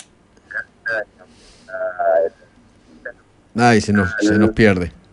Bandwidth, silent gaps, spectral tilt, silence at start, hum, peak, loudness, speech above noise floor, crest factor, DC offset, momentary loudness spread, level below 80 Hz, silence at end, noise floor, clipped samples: 11 kHz; none; -6 dB/octave; 0.5 s; none; -2 dBFS; -18 LUFS; 35 dB; 18 dB; under 0.1%; 22 LU; -44 dBFS; 0.2 s; -50 dBFS; under 0.1%